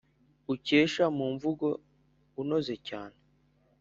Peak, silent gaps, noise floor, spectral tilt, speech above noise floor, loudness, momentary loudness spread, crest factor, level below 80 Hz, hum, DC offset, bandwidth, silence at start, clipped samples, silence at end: -10 dBFS; none; -68 dBFS; -4 dB/octave; 38 dB; -30 LUFS; 18 LU; 22 dB; -68 dBFS; none; under 0.1%; 7.6 kHz; 0.5 s; under 0.1%; 0.7 s